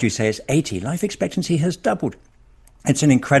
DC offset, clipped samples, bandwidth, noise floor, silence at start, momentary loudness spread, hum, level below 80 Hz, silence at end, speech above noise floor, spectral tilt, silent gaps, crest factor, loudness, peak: under 0.1%; under 0.1%; 12.5 kHz; -50 dBFS; 0 s; 9 LU; none; -50 dBFS; 0 s; 31 dB; -5.5 dB/octave; none; 20 dB; -21 LUFS; 0 dBFS